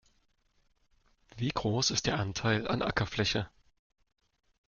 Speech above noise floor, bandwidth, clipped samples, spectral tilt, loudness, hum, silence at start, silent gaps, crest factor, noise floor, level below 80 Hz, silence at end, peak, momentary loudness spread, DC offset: 41 dB; 7.4 kHz; under 0.1%; -4 dB/octave; -31 LUFS; none; 1.35 s; none; 20 dB; -72 dBFS; -54 dBFS; 1.2 s; -14 dBFS; 7 LU; under 0.1%